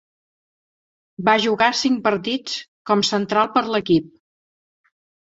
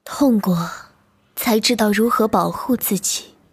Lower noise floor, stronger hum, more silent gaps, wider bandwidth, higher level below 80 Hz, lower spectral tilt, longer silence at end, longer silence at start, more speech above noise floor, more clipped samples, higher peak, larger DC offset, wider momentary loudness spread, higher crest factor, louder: first, under -90 dBFS vs -56 dBFS; neither; first, 2.68-2.85 s vs none; second, 8 kHz vs 17.5 kHz; second, -62 dBFS vs -54 dBFS; about the same, -4 dB/octave vs -4 dB/octave; first, 1.15 s vs 0.25 s; first, 1.2 s vs 0.05 s; first, over 71 dB vs 39 dB; neither; about the same, -2 dBFS vs -4 dBFS; neither; second, 7 LU vs 10 LU; about the same, 20 dB vs 16 dB; about the same, -19 LUFS vs -18 LUFS